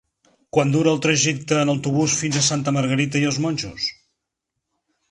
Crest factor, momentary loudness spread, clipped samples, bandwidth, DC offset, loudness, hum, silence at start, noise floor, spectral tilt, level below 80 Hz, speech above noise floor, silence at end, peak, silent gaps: 18 dB; 7 LU; under 0.1%; 11 kHz; under 0.1%; -20 LUFS; none; 0.55 s; -80 dBFS; -4 dB/octave; -56 dBFS; 60 dB; 1.2 s; -4 dBFS; none